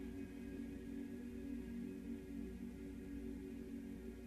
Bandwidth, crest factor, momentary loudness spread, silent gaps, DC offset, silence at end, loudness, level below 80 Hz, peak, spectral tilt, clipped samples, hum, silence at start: 14 kHz; 12 dB; 2 LU; none; under 0.1%; 0 s; -50 LUFS; -58 dBFS; -36 dBFS; -7.5 dB/octave; under 0.1%; none; 0 s